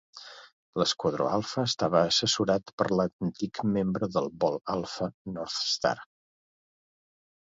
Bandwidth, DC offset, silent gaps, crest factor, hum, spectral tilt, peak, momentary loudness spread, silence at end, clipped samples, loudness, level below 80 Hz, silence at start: 7.8 kHz; under 0.1%; 0.53-0.73 s, 2.73-2.78 s, 3.13-3.19 s, 5.14-5.25 s; 22 dB; none; -4.5 dB/octave; -8 dBFS; 11 LU; 1.5 s; under 0.1%; -28 LUFS; -62 dBFS; 0.15 s